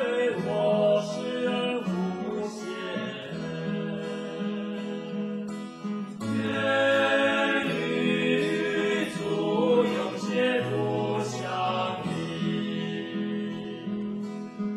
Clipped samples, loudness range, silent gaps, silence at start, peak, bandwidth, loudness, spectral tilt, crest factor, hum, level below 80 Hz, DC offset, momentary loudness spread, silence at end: under 0.1%; 8 LU; none; 0 s; -12 dBFS; 12 kHz; -28 LUFS; -5.5 dB/octave; 16 dB; none; -68 dBFS; under 0.1%; 11 LU; 0 s